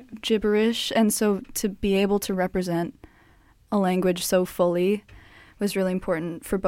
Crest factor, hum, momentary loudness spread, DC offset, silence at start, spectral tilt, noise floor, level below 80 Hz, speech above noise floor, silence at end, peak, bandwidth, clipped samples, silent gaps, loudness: 14 dB; none; 7 LU; under 0.1%; 0 s; -5 dB/octave; -56 dBFS; -50 dBFS; 33 dB; 0 s; -10 dBFS; 16.5 kHz; under 0.1%; none; -24 LUFS